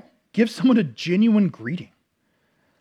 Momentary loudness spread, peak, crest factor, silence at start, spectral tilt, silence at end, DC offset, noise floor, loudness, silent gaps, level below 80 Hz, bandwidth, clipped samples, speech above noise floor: 13 LU; -6 dBFS; 16 dB; 0.35 s; -7 dB/octave; 0.95 s; under 0.1%; -69 dBFS; -21 LUFS; none; -76 dBFS; 11.5 kHz; under 0.1%; 49 dB